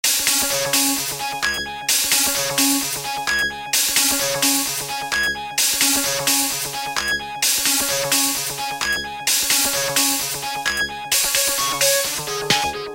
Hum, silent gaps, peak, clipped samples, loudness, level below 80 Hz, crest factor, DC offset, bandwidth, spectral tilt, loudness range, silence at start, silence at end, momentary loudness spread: none; none; 0 dBFS; under 0.1%; -18 LUFS; -50 dBFS; 20 dB; under 0.1%; 17 kHz; 0 dB/octave; 1 LU; 0.05 s; 0 s; 7 LU